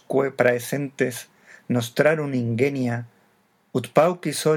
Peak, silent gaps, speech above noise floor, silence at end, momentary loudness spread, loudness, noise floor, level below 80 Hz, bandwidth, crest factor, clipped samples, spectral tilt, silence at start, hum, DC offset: -2 dBFS; none; 41 dB; 0 s; 9 LU; -23 LUFS; -63 dBFS; -76 dBFS; 18.5 kHz; 20 dB; under 0.1%; -5.5 dB/octave; 0.1 s; none; under 0.1%